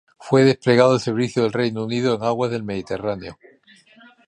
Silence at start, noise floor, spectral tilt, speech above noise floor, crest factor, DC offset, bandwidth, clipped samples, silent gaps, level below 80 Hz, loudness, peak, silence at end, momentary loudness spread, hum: 0.2 s; -52 dBFS; -6.5 dB/octave; 33 dB; 18 dB; under 0.1%; 10.5 kHz; under 0.1%; none; -56 dBFS; -20 LUFS; -2 dBFS; 0.95 s; 12 LU; none